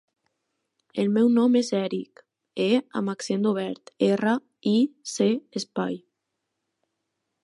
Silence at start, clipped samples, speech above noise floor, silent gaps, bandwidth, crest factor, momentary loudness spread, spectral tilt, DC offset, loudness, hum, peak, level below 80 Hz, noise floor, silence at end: 0.95 s; under 0.1%; 57 dB; none; 11.5 kHz; 16 dB; 13 LU; -5.5 dB/octave; under 0.1%; -25 LUFS; none; -10 dBFS; -78 dBFS; -81 dBFS; 1.45 s